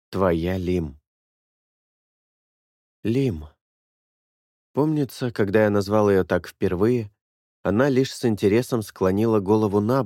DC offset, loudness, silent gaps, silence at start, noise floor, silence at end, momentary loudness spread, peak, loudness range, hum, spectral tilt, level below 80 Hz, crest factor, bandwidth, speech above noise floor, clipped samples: under 0.1%; -22 LUFS; 1.07-3.03 s, 3.61-4.74 s, 7.21-7.64 s; 0.1 s; under -90 dBFS; 0 s; 8 LU; -6 dBFS; 10 LU; none; -7 dB/octave; -50 dBFS; 18 dB; 16.5 kHz; over 69 dB; under 0.1%